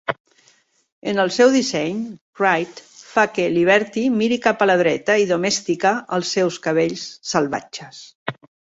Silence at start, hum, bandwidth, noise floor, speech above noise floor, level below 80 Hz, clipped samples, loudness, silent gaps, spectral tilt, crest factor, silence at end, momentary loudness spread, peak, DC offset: 0.1 s; none; 8 kHz; -58 dBFS; 39 dB; -64 dBFS; under 0.1%; -19 LUFS; 0.20-0.25 s, 0.92-1.02 s, 2.21-2.33 s, 8.15-8.26 s; -4 dB/octave; 18 dB; 0.35 s; 16 LU; -2 dBFS; under 0.1%